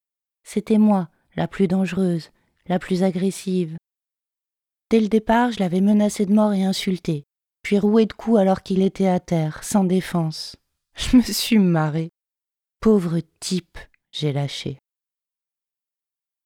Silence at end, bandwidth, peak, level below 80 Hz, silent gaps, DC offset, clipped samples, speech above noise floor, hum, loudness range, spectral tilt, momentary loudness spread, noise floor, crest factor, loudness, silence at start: 1.7 s; 17 kHz; -4 dBFS; -46 dBFS; none; under 0.1%; under 0.1%; 69 dB; none; 5 LU; -6 dB/octave; 12 LU; -89 dBFS; 16 dB; -21 LUFS; 0.5 s